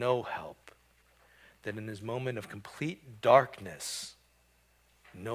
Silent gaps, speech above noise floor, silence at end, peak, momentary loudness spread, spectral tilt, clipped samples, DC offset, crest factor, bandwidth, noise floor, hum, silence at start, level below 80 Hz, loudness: none; 36 dB; 0 s; -8 dBFS; 20 LU; -4.5 dB/octave; under 0.1%; under 0.1%; 26 dB; 16 kHz; -67 dBFS; 60 Hz at -60 dBFS; 0 s; -68 dBFS; -32 LUFS